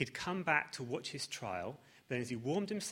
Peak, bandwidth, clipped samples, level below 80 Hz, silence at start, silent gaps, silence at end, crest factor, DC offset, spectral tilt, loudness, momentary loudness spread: -16 dBFS; 16 kHz; under 0.1%; -74 dBFS; 0 s; none; 0 s; 22 dB; under 0.1%; -4 dB/octave; -38 LUFS; 9 LU